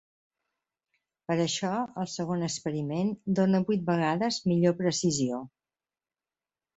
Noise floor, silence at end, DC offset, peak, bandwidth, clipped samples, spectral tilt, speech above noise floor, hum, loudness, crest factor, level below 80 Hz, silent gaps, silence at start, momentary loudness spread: under -90 dBFS; 1.3 s; under 0.1%; -12 dBFS; 8.2 kHz; under 0.1%; -5.5 dB/octave; over 62 dB; none; -28 LUFS; 16 dB; -68 dBFS; none; 1.3 s; 7 LU